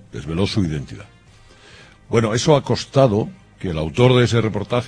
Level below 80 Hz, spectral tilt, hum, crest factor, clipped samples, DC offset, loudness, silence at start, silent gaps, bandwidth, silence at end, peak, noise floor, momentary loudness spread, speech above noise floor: -42 dBFS; -6 dB/octave; none; 18 dB; under 0.1%; under 0.1%; -18 LUFS; 0.15 s; none; 10.5 kHz; 0 s; 0 dBFS; -48 dBFS; 15 LU; 30 dB